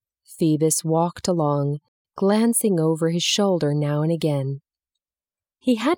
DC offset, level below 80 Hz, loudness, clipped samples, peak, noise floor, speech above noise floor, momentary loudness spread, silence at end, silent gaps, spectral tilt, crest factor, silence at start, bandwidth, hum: under 0.1%; -64 dBFS; -21 LUFS; under 0.1%; -6 dBFS; under -90 dBFS; over 69 dB; 8 LU; 0 s; 1.88-2.05 s; -5 dB/octave; 16 dB; 0.3 s; 17.5 kHz; none